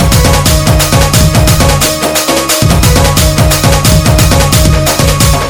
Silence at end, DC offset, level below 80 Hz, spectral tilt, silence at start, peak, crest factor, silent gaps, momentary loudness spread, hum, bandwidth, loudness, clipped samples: 0 s; under 0.1%; -14 dBFS; -4 dB/octave; 0 s; 0 dBFS; 6 dB; none; 2 LU; none; over 20 kHz; -7 LUFS; 3%